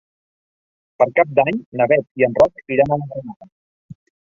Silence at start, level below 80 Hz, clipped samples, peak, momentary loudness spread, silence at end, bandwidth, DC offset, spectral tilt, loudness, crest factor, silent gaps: 1 s; -54 dBFS; under 0.1%; -2 dBFS; 12 LU; 0.4 s; 7.2 kHz; under 0.1%; -8 dB/octave; -17 LUFS; 18 dB; 1.66-1.72 s, 2.11-2.15 s, 3.36-3.40 s, 3.52-3.89 s